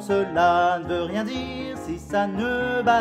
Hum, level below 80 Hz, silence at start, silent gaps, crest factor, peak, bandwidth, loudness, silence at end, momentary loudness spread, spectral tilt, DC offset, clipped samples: none; -48 dBFS; 0 s; none; 16 dB; -8 dBFS; 14 kHz; -24 LUFS; 0 s; 12 LU; -5.5 dB/octave; under 0.1%; under 0.1%